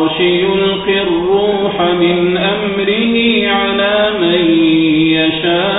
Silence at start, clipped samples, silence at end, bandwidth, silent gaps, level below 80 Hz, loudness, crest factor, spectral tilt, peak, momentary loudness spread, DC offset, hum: 0 s; under 0.1%; 0 s; 4 kHz; none; -42 dBFS; -12 LUFS; 12 dB; -11 dB/octave; 0 dBFS; 3 LU; under 0.1%; none